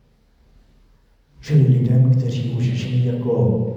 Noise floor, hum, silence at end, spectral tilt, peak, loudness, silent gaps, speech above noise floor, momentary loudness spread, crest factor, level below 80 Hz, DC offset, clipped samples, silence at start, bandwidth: -56 dBFS; none; 0 s; -9 dB/octave; -6 dBFS; -18 LUFS; none; 39 dB; 6 LU; 14 dB; -52 dBFS; under 0.1%; under 0.1%; 1.4 s; 7.2 kHz